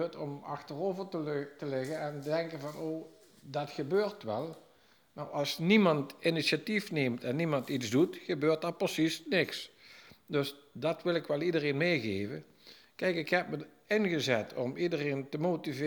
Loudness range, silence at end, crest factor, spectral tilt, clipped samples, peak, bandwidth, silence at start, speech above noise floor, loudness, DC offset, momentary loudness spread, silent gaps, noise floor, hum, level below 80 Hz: 7 LU; 0 s; 22 dB; -5.5 dB/octave; under 0.1%; -12 dBFS; over 20 kHz; 0 s; 33 dB; -33 LUFS; under 0.1%; 10 LU; none; -65 dBFS; none; -78 dBFS